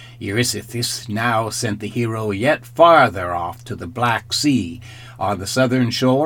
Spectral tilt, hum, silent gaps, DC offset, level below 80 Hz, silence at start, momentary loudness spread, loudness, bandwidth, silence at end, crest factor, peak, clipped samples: -4.5 dB/octave; none; none; under 0.1%; -52 dBFS; 0 s; 13 LU; -18 LUFS; 19 kHz; 0 s; 18 dB; 0 dBFS; under 0.1%